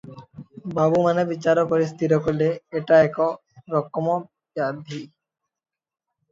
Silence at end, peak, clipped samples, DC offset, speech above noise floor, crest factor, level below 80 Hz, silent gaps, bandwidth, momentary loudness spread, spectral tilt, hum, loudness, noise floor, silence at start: 1.25 s; -4 dBFS; under 0.1%; under 0.1%; 21 dB; 18 dB; -60 dBFS; none; 7.6 kHz; 18 LU; -7.5 dB/octave; none; -22 LUFS; -42 dBFS; 0.05 s